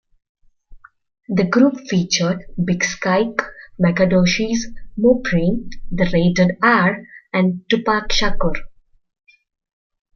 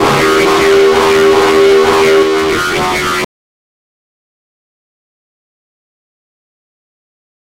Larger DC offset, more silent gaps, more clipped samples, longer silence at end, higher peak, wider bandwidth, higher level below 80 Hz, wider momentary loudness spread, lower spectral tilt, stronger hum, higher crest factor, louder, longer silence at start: neither; neither; neither; second, 1.45 s vs 4.15 s; about the same, 0 dBFS vs -2 dBFS; second, 7 kHz vs 16 kHz; first, -34 dBFS vs -40 dBFS; first, 9 LU vs 6 LU; first, -5 dB/octave vs -3.5 dB/octave; neither; first, 18 dB vs 10 dB; second, -18 LUFS vs -9 LUFS; first, 0.7 s vs 0 s